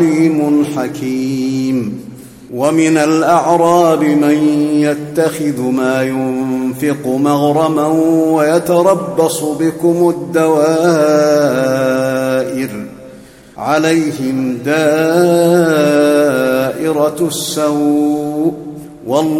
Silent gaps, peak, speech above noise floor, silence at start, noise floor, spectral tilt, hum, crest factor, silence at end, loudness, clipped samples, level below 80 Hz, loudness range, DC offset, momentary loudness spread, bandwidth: none; 0 dBFS; 25 dB; 0 s; -37 dBFS; -5.5 dB/octave; none; 12 dB; 0 s; -13 LUFS; under 0.1%; -54 dBFS; 3 LU; under 0.1%; 7 LU; 16.5 kHz